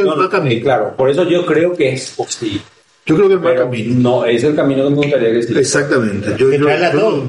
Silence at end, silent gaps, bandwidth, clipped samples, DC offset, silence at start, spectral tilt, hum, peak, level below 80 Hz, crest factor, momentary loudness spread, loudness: 0 s; none; 11.5 kHz; under 0.1%; under 0.1%; 0 s; -5.5 dB/octave; none; -2 dBFS; -54 dBFS; 12 dB; 8 LU; -14 LUFS